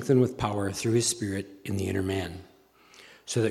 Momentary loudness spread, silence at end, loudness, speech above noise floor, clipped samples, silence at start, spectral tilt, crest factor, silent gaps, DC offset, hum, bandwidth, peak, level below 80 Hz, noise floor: 12 LU; 0 s; -28 LUFS; 29 dB; under 0.1%; 0 s; -5 dB/octave; 18 dB; none; under 0.1%; none; 15 kHz; -10 dBFS; -56 dBFS; -56 dBFS